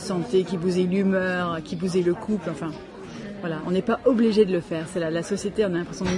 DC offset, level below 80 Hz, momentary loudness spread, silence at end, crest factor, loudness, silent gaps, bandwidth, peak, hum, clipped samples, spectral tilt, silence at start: under 0.1%; -54 dBFS; 13 LU; 0 s; 18 dB; -24 LUFS; none; 11.5 kHz; -6 dBFS; none; under 0.1%; -6.5 dB/octave; 0 s